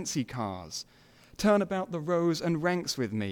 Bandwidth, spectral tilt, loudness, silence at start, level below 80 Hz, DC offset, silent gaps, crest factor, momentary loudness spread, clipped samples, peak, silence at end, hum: 18 kHz; -5 dB/octave; -30 LUFS; 0 s; -60 dBFS; under 0.1%; none; 18 dB; 13 LU; under 0.1%; -12 dBFS; 0 s; none